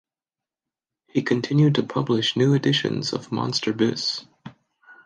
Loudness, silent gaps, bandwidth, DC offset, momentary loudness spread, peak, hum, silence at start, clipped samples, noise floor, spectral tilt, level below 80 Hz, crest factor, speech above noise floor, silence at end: -22 LUFS; none; 9.4 kHz; under 0.1%; 8 LU; -6 dBFS; none; 1.15 s; under 0.1%; under -90 dBFS; -5.5 dB/octave; -66 dBFS; 18 dB; over 68 dB; 0.1 s